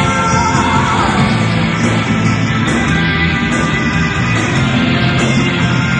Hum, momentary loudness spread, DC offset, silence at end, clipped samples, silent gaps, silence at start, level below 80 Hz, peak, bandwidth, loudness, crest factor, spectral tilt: none; 2 LU; under 0.1%; 0 s; under 0.1%; none; 0 s; -30 dBFS; 0 dBFS; 10 kHz; -13 LUFS; 12 dB; -5 dB/octave